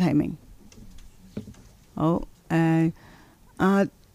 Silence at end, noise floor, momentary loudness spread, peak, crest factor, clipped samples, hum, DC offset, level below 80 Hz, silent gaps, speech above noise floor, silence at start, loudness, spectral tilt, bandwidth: 0.25 s; -52 dBFS; 20 LU; -10 dBFS; 16 dB; under 0.1%; none; under 0.1%; -50 dBFS; none; 29 dB; 0 s; -25 LUFS; -8 dB/octave; 13.5 kHz